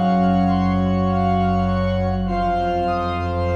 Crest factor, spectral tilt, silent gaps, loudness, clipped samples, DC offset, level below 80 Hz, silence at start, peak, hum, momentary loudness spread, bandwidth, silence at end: 12 dB; -9 dB/octave; none; -20 LUFS; under 0.1%; under 0.1%; -34 dBFS; 0 s; -8 dBFS; none; 4 LU; 6.6 kHz; 0 s